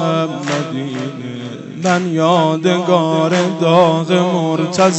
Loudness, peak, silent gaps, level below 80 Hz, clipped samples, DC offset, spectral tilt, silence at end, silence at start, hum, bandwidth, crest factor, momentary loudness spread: -15 LUFS; 0 dBFS; none; -64 dBFS; under 0.1%; under 0.1%; -5.5 dB/octave; 0 s; 0 s; none; 8.4 kHz; 14 dB; 12 LU